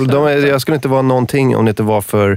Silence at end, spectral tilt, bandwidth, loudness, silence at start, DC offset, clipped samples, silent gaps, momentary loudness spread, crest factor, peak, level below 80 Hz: 0 s; -6.5 dB/octave; 16.5 kHz; -13 LUFS; 0 s; under 0.1%; under 0.1%; none; 3 LU; 10 dB; -4 dBFS; -48 dBFS